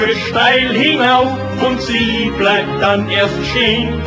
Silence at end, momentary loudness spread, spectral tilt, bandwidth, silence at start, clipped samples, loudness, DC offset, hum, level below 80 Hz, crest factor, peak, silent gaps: 0 s; 5 LU; -5 dB/octave; 8 kHz; 0 s; under 0.1%; -13 LUFS; under 0.1%; none; -34 dBFS; 14 dB; 0 dBFS; none